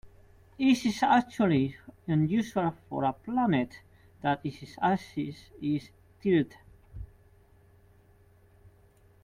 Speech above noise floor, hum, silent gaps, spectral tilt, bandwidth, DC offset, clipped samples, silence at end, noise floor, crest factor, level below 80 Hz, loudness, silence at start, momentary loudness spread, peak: 32 dB; none; none; -6.5 dB/octave; 14.5 kHz; under 0.1%; under 0.1%; 2.2 s; -60 dBFS; 18 dB; -58 dBFS; -29 LUFS; 0.05 s; 14 LU; -12 dBFS